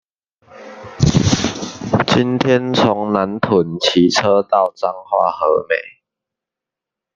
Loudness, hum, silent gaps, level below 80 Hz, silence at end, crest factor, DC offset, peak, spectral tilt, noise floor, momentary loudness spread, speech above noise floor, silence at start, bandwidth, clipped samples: -16 LUFS; none; none; -42 dBFS; 1.25 s; 16 dB; under 0.1%; -2 dBFS; -5 dB/octave; -85 dBFS; 8 LU; 70 dB; 0.55 s; 9.6 kHz; under 0.1%